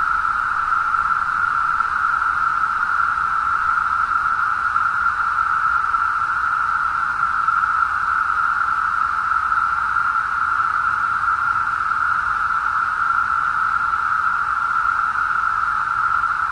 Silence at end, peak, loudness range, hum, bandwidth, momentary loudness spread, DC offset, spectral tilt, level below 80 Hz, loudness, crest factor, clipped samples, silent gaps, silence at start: 0 s; -6 dBFS; 0 LU; none; 10.5 kHz; 1 LU; under 0.1%; -2.5 dB/octave; -48 dBFS; -18 LUFS; 14 dB; under 0.1%; none; 0 s